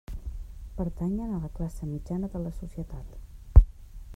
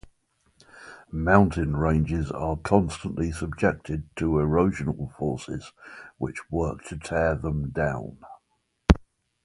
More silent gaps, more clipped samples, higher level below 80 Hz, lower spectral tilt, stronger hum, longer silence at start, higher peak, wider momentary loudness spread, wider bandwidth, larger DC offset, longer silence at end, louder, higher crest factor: neither; neither; first, -28 dBFS vs -36 dBFS; first, -10 dB/octave vs -7.5 dB/octave; neither; second, 0.1 s vs 0.75 s; about the same, -2 dBFS vs 0 dBFS; first, 22 LU vs 15 LU; second, 7.8 kHz vs 11.5 kHz; neither; second, 0 s vs 0.45 s; second, -29 LUFS vs -26 LUFS; about the same, 26 dB vs 26 dB